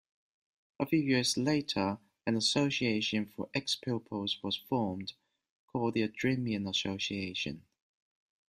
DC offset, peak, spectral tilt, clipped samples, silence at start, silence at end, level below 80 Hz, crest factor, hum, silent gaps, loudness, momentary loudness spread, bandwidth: under 0.1%; -16 dBFS; -4.5 dB/octave; under 0.1%; 0.8 s; 0.9 s; -68 dBFS; 18 dB; none; 5.49-5.68 s; -33 LUFS; 9 LU; 15 kHz